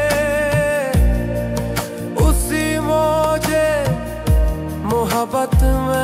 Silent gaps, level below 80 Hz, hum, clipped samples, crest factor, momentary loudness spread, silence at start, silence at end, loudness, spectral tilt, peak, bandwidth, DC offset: none; -22 dBFS; none; under 0.1%; 16 dB; 5 LU; 0 s; 0 s; -18 LUFS; -5.5 dB/octave; 0 dBFS; 16 kHz; under 0.1%